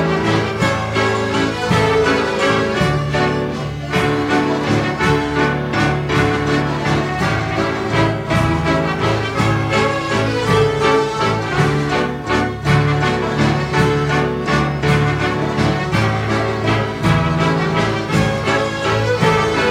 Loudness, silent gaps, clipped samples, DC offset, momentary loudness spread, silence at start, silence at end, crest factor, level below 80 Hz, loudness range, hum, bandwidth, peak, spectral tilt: -17 LUFS; none; under 0.1%; under 0.1%; 3 LU; 0 s; 0 s; 14 dB; -34 dBFS; 1 LU; none; 15 kHz; -2 dBFS; -6 dB/octave